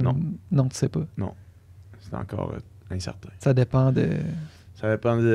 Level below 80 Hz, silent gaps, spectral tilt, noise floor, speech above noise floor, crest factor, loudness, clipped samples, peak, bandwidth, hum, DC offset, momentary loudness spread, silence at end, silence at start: -50 dBFS; none; -7.5 dB/octave; -48 dBFS; 24 dB; 16 dB; -26 LUFS; under 0.1%; -8 dBFS; 11 kHz; none; under 0.1%; 15 LU; 0 s; 0 s